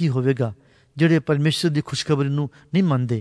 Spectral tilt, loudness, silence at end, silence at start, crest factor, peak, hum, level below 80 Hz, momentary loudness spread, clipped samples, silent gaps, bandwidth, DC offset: -6.5 dB/octave; -21 LUFS; 0 s; 0 s; 14 dB; -6 dBFS; none; -58 dBFS; 7 LU; under 0.1%; none; 11 kHz; under 0.1%